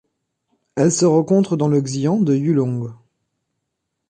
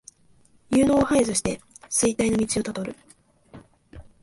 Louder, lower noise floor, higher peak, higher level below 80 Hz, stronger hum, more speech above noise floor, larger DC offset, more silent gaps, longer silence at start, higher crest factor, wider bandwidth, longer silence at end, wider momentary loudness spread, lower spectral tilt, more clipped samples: first, -18 LUFS vs -23 LUFS; first, -77 dBFS vs -58 dBFS; first, -4 dBFS vs -8 dBFS; second, -62 dBFS vs -48 dBFS; neither; first, 60 dB vs 35 dB; neither; neither; about the same, 0.75 s vs 0.7 s; about the same, 16 dB vs 18 dB; about the same, 10.5 kHz vs 11.5 kHz; first, 1.15 s vs 0.2 s; about the same, 11 LU vs 13 LU; first, -6.5 dB/octave vs -4 dB/octave; neither